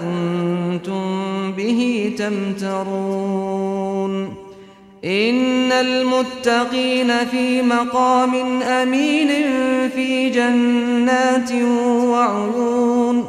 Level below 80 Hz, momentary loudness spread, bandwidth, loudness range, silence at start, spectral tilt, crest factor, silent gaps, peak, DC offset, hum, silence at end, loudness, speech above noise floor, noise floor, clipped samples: -60 dBFS; 7 LU; 11.5 kHz; 5 LU; 0 s; -5 dB/octave; 14 dB; none; -4 dBFS; under 0.1%; none; 0 s; -18 LUFS; 25 dB; -42 dBFS; under 0.1%